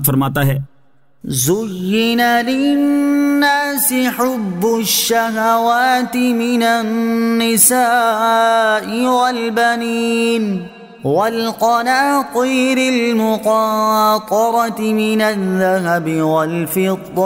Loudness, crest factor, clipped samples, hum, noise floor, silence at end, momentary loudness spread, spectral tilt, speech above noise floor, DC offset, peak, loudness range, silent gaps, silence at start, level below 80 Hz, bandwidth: -15 LUFS; 14 dB; under 0.1%; none; -57 dBFS; 0 s; 5 LU; -4 dB/octave; 43 dB; under 0.1%; 0 dBFS; 3 LU; none; 0 s; -54 dBFS; 16.5 kHz